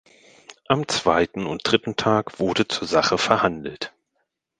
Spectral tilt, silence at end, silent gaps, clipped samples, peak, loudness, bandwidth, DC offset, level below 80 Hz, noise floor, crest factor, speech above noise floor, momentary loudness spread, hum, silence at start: -4 dB/octave; 0.7 s; none; under 0.1%; 0 dBFS; -22 LUFS; 10 kHz; under 0.1%; -52 dBFS; -75 dBFS; 22 dB; 53 dB; 10 LU; none; 0.5 s